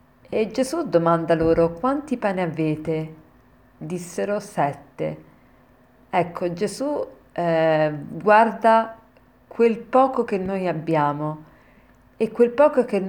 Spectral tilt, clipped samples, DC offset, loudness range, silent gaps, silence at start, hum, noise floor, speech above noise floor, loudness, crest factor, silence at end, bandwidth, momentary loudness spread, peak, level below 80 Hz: -6.5 dB/octave; under 0.1%; under 0.1%; 8 LU; none; 0.3 s; none; -54 dBFS; 33 dB; -22 LUFS; 20 dB; 0 s; 18 kHz; 13 LU; -2 dBFS; -52 dBFS